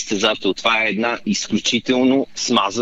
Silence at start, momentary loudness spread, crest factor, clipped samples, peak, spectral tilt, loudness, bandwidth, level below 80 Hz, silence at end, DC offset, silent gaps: 0 s; 4 LU; 18 dB; under 0.1%; 0 dBFS; -3 dB/octave; -18 LUFS; 8.2 kHz; -56 dBFS; 0 s; under 0.1%; none